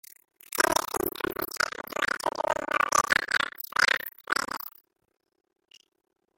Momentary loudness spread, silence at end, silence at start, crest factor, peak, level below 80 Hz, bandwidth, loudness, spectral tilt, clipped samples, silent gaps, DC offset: 8 LU; 1.7 s; 0.5 s; 26 dB; -4 dBFS; -60 dBFS; 17 kHz; -27 LUFS; -1 dB/octave; under 0.1%; none; under 0.1%